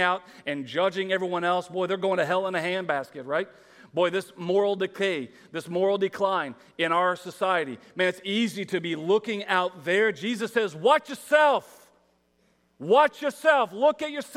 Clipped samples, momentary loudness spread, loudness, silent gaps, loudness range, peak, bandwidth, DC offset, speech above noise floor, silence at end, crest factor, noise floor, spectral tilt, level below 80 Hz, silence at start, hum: under 0.1%; 9 LU; -26 LUFS; none; 3 LU; -6 dBFS; 15.5 kHz; under 0.1%; 41 dB; 0 s; 20 dB; -67 dBFS; -4.5 dB/octave; -78 dBFS; 0 s; none